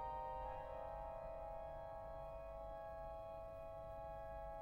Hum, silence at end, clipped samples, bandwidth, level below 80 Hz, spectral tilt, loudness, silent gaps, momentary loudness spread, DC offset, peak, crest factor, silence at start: none; 0 s; under 0.1%; 16 kHz; -58 dBFS; -7.5 dB/octave; -51 LUFS; none; 4 LU; under 0.1%; -38 dBFS; 12 dB; 0 s